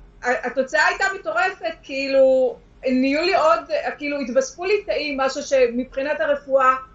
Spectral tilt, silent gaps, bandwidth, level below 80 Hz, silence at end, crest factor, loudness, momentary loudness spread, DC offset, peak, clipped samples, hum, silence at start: -3 dB/octave; none; 7.8 kHz; -52 dBFS; 0.1 s; 16 dB; -20 LUFS; 8 LU; under 0.1%; -4 dBFS; under 0.1%; none; 0 s